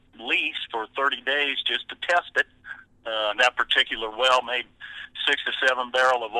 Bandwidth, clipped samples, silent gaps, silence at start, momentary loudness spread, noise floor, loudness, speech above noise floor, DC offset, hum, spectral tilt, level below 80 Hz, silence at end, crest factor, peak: 12 kHz; under 0.1%; none; 0.2 s; 11 LU; -44 dBFS; -23 LUFS; 20 dB; under 0.1%; none; -0.5 dB/octave; -60 dBFS; 0 s; 20 dB; -4 dBFS